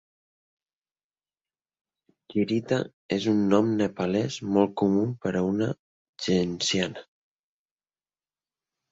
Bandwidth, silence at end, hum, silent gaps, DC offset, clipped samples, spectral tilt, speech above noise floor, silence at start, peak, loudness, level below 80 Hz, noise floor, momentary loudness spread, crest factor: 8 kHz; 1.9 s; none; 2.93-3.09 s, 5.79-6.13 s; under 0.1%; under 0.1%; -5.5 dB/octave; over 65 dB; 2.3 s; -8 dBFS; -26 LUFS; -60 dBFS; under -90 dBFS; 9 LU; 20 dB